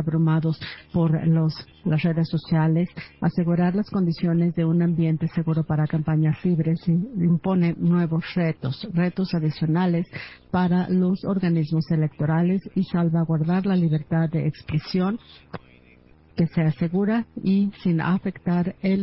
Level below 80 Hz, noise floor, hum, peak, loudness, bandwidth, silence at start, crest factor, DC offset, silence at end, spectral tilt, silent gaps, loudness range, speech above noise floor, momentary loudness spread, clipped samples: -54 dBFS; -53 dBFS; none; -10 dBFS; -23 LUFS; 5.8 kHz; 0 s; 12 dB; under 0.1%; 0 s; -12.5 dB/octave; none; 3 LU; 31 dB; 6 LU; under 0.1%